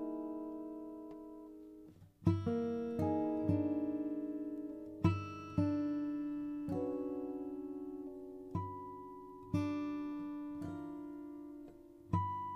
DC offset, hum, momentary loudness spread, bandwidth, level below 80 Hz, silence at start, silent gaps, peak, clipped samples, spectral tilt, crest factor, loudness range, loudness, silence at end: under 0.1%; none; 16 LU; 6.6 kHz; -64 dBFS; 0 s; none; -18 dBFS; under 0.1%; -9.5 dB/octave; 22 dB; 6 LU; -40 LUFS; 0 s